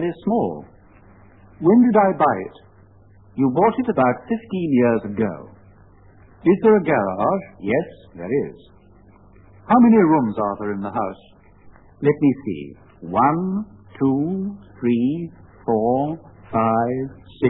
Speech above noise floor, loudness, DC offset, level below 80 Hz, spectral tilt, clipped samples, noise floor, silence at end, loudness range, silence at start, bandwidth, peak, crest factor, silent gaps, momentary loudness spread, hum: 31 dB; -20 LUFS; 0.1%; -54 dBFS; -12.5 dB/octave; under 0.1%; -50 dBFS; 0 s; 4 LU; 0 s; 4 kHz; -4 dBFS; 16 dB; none; 17 LU; none